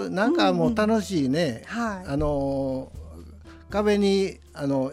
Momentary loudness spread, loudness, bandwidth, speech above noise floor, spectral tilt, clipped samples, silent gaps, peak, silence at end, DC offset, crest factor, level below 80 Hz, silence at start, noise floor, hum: 12 LU; -24 LUFS; 15 kHz; 21 dB; -6 dB/octave; under 0.1%; none; -8 dBFS; 0 s; under 0.1%; 16 dB; -44 dBFS; 0 s; -45 dBFS; none